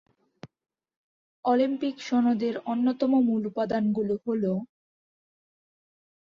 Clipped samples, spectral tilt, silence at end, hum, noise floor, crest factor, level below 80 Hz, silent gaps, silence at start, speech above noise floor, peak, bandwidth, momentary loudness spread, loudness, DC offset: under 0.1%; -7.5 dB/octave; 1.65 s; none; -51 dBFS; 16 dB; -70 dBFS; 0.97-1.43 s; 0.45 s; 25 dB; -12 dBFS; 7.2 kHz; 6 LU; -26 LUFS; under 0.1%